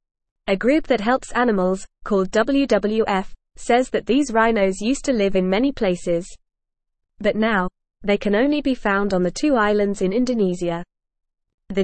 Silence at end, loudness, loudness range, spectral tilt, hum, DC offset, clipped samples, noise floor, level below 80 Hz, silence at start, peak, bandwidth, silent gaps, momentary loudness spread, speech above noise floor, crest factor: 0 s; -20 LUFS; 3 LU; -5.5 dB/octave; none; 0.5%; under 0.1%; -77 dBFS; -42 dBFS; 0.45 s; -6 dBFS; 8.8 kHz; 11.54-11.58 s; 7 LU; 58 dB; 16 dB